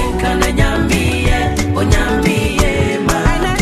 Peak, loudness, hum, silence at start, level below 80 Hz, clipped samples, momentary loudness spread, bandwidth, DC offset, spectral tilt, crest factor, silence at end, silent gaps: 0 dBFS; -15 LUFS; none; 0 s; -20 dBFS; under 0.1%; 2 LU; 13.5 kHz; under 0.1%; -5 dB/octave; 14 dB; 0 s; none